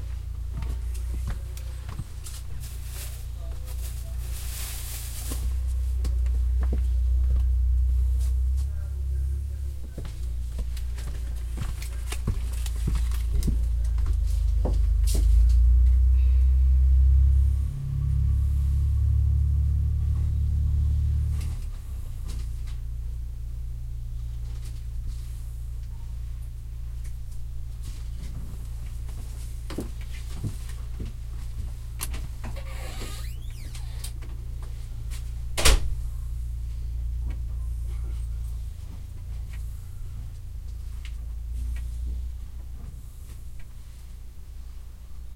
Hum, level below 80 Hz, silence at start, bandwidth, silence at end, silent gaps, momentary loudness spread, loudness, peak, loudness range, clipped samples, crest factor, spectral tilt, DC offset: none; -26 dBFS; 0 s; 16 kHz; 0 s; none; 16 LU; -29 LUFS; -4 dBFS; 14 LU; under 0.1%; 22 dB; -5 dB/octave; under 0.1%